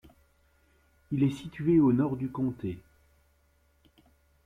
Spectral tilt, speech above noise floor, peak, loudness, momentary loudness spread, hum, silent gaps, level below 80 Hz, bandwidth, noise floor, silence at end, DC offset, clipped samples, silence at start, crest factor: -9 dB/octave; 40 dB; -14 dBFS; -28 LUFS; 15 LU; none; none; -60 dBFS; 10.5 kHz; -67 dBFS; 1.65 s; under 0.1%; under 0.1%; 1.1 s; 18 dB